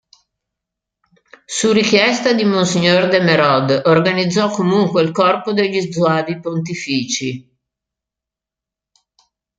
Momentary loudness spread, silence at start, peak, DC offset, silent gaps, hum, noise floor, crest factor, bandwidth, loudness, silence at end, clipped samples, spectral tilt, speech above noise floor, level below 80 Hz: 9 LU; 1.5 s; 0 dBFS; under 0.1%; none; none; -86 dBFS; 16 dB; 9.4 kHz; -15 LUFS; 2.2 s; under 0.1%; -4.5 dB/octave; 71 dB; -60 dBFS